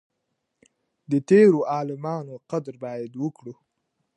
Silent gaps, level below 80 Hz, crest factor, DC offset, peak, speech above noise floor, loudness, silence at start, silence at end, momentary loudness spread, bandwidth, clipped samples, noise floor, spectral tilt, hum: none; -74 dBFS; 20 dB; under 0.1%; -6 dBFS; 55 dB; -23 LUFS; 1.1 s; 0.65 s; 18 LU; 9.2 kHz; under 0.1%; -78 dBFS; -8 dB/octave; none